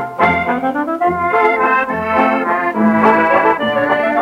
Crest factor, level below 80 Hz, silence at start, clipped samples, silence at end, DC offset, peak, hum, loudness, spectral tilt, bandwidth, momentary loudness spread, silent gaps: 14 dB; -50 dBFS; 0 s; under 0.1%; 0 s; under 0.1%; 0 dBFS; none; -14 LUFS; -7 dB/octave; 15.5 kHz; 5 LU; none